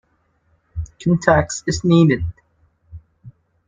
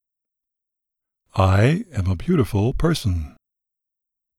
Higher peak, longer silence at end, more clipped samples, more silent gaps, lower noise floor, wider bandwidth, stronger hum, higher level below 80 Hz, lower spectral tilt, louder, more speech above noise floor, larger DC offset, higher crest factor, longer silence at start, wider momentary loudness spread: first, 0 dBFS vs -4 dBFS; second, 0.4 s vs 1.1 s; neither; neither; second, -63 dBFS vs -84 dBFS; second, 9.2 kHz vs 13.5 kHz; neither; about the same, -40 dBFS vs -38 dBFS; about the same, -6 dB/octave vs -7 dB/octave; first, -17 LUFS vs -21 LUFS; second, 47 dB vs 65 dB; neither; about the same, 20 dB vs 18 dB; second, 0.75 s vs 1.35 s; first, 18 LU vs 11 LU